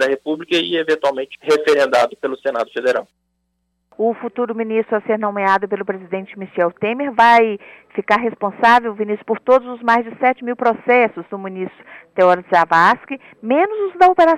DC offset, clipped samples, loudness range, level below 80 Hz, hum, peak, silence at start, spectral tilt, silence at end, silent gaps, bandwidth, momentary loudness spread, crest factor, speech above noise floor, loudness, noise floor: under 0.1%; under 0.1%; 5 LU; -60 dBFS; none; -2 dBFS; 0 s; -5 dB/octave; 0 s; none; 13 kHz; 14 LU; 14 dB; 53 dB; -17 LUFS; -70 dBFS